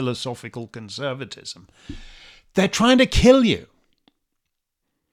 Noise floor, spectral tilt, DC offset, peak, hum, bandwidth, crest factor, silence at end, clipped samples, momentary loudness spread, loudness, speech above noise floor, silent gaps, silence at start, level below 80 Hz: -78 dBFS; -5 dB/octave; under 0.1%; -2 dBFS; none; 15 kHz; 20 dB; 1.5 s; under 0.1%; 26 LU; -19 LUFS; 58 dB; none; 0 s; -38 dBFS